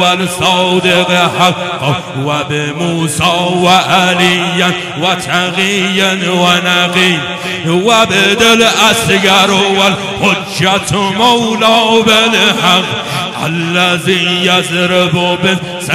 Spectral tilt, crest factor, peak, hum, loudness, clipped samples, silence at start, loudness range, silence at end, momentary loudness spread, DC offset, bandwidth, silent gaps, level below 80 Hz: -3.5 dB/octave; 10 dB; 0 dBFS; none; -10 LUFS; under 0.1%; 0 s; 3 LU; 0 s; 8 LU; under 0.1%; 16 kHz; none; -46 dBFS